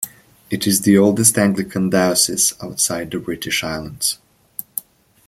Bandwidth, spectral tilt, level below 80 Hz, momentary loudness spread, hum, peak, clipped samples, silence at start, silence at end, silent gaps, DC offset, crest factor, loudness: 16.5 kHz; -3.5 dB/octave; -52 dBFS; 16 LU; none; 0 dBFS; under 0.1%; 0 s; 0.45 s; none; under 0.1%; 18 dB; -17 LUFS